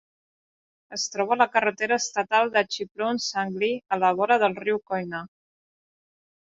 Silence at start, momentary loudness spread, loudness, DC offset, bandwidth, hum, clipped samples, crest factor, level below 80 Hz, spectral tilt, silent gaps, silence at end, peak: 0.9 s; 9 LU; -24 LUFS; under 0.1%; 7.8 kHz; none; under 0.1%; 22 dB; -72 dBFS; -3 dB/octave; 2.91-2.95 s; 1.25 s; -4 dBFS